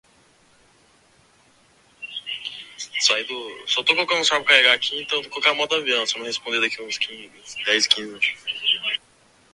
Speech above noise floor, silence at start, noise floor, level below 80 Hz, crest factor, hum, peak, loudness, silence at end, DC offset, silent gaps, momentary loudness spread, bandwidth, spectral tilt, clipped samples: 35 dB; 2 s; -57 dBFS; -70 dBFS; 24 dB; none; 0 dBFS; -20 LUFS; 0.55 s; under 0.1%; none; 14 LU; 11.5 kHz; 0 dB/octave; under 0.1%